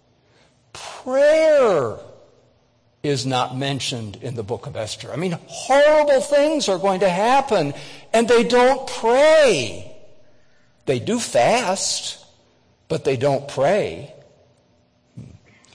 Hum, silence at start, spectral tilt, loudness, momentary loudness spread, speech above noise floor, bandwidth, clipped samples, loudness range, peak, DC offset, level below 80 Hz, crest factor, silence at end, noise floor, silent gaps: none; 0.75 s; -4 dB/octave; -19 LUFS; 16 LU; 42 dB; 10.5 kHz; under 0.1%; 8 LU; -8 dBFS; under 0.1%; -56 dBFS; 12 dB; 0.45 s; -60 dBFS; none